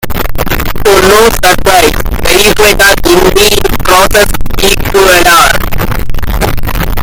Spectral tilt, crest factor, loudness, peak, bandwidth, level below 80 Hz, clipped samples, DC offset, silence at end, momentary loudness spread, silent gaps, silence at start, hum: -3 dB/octave; 6 dB; -6 LUFS; 0 dBFS; over 20 kHz; -16 dBFS; 6%; under 0.1%; 0 s; 10 LU; none; 0 s; none